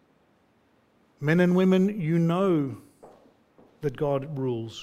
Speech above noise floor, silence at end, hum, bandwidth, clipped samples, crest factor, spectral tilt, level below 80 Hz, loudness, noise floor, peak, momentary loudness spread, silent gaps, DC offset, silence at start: 41 dB; 0 s; none; 8.6 kHz; under 0.1%; 18 dB; -8 dB/octave; -64 dBFS; -25 LUFS; -64 dBFS; -10 dBFS; 13 LU; none; under 0.1%; 1.2 s